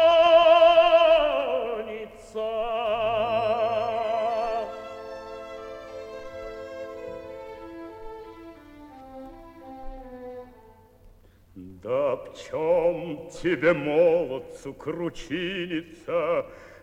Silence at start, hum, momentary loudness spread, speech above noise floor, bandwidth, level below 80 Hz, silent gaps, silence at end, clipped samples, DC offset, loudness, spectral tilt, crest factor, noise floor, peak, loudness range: 0 s; none; 25 LU; 28 dB; 8.6 kHz; -52 dBFS; none; 0.1 s; under 0.1%; under 0.1%; -23 LUFS; -5.5 dB/octave; 18 dB; -54 dBFS; -8 dBFS; 20 LU